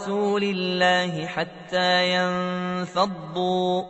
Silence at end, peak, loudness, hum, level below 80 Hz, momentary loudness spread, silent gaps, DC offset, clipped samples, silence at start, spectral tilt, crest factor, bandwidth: 0 s; -8 dBFS; -23 LUFS; none; -64 dBFS; 8 LU; none; under 0.1%; under 0.1%; 0 s; -5 dB/octave; 16 dB; 8.4 kHz